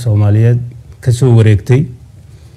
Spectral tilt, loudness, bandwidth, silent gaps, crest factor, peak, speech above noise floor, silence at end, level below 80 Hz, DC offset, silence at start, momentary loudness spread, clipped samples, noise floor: -8 dB/octave; -11 LUFS; 11 kHz; none; 10 dB; 0 dBFS; 27 dB; 0.2 s; -40 dBFS; under 0.1%; 0 s; 12 LU; under 0.1%; -36 dBFS